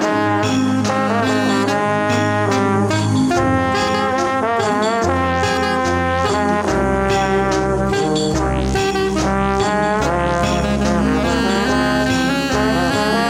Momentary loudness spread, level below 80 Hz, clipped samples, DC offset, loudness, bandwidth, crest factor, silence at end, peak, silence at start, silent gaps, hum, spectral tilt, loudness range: 1 LU; -32 dBFS; under 0.1%; under 0.1%; -17 LUFS; 16 kHz; 12 dB; 0 s; -4 dBFS; 0 s; none; none; -5 dB/octave; 1 LU